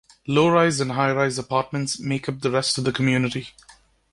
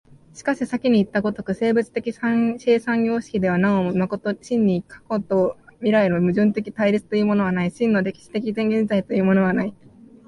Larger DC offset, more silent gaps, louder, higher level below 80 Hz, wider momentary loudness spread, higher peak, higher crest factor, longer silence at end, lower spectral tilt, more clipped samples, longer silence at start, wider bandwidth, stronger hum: neither; neither; about the same, -22 LUFS vs -21 LUFS; about the same, -56 dBFS vs -56 dBFS; about the same, 9 LU vs 7 LU; about the same, -6 dBFS vs -6 dBFS; about the same, 18 dB vs 14 dB; second, 0.4 s vs 0.55 s; second, -5 dB/octave vs -7.5 dB/octave; neither; about the same, 0.25 s vs 0.35 s; about the same, 11.5 kHz vs 11 kHz; neither